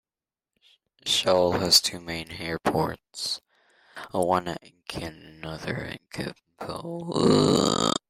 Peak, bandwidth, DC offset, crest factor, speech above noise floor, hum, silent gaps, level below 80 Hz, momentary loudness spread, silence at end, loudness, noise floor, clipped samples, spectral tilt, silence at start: -4 dBFS; 16 kHz; under 0.1%; 22 dB; over 64 dB; none; none; -56 dBFS; 18 LU; 0.15 s; -25 LUFS; under -90 dBFS; under 0.1%; -3.5 dB/octave; 1.05 s